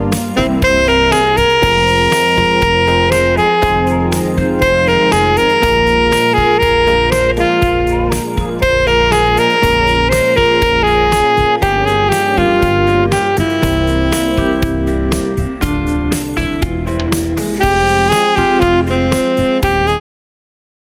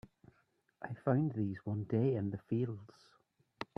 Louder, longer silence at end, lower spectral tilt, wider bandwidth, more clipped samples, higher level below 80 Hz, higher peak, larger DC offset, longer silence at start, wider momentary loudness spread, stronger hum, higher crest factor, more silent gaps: first, -13 LUFS vs -37 LUFS; first, 1 s vs 0.15 s; second, -5 dB/octave vs -10 dB/octave; first, over 20 kHz vs 6.2 kHz; neither; first, -24 dBFS vs -74 dBFS; first, 0 dBFS vs -18 dBFS; neither; second, 0 s vs 0.8 s; second, 6 LU vs 15 LU; neither; second, 12 dB vs 20 dB; neither